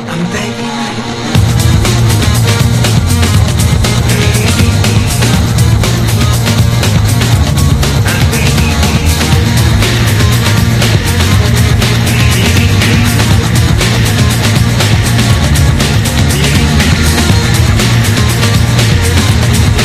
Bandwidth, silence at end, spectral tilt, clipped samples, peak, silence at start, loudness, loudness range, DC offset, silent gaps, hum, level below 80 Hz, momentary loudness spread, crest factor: 15.5 kHz; 0 s; -4.5 dB/octave; 0.7%; 0 dBFS; 0 s; -9 LUFS; 1 LU; under 0.1%; none; none; -18 dBFS; 1 LU; 8 dB